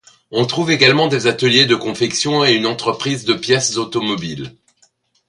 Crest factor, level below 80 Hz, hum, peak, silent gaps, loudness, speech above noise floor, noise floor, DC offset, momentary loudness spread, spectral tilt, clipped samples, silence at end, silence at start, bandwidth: 16 dB; -56 dBFS; none; 0 dBFS; none; -15 LUFS; 42 dB; -58 dBFS; under 0.1%; 11 LU; -3.5 dB/octave; under 0.1%; 0.8 s; 0.3 s; 11.5 kHz